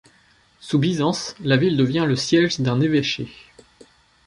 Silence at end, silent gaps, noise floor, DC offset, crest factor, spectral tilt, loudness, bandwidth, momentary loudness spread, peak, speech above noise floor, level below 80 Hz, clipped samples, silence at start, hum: 0.95 s; none; -57 dBFS; under 0.1%; 16 dB; -5.5 dB/octave; -20 LUFS; 11.5 kHz; 7 LU; -6 dBFS; 37 dB; -56 dBFS; under 0.1%; 0.65 s; none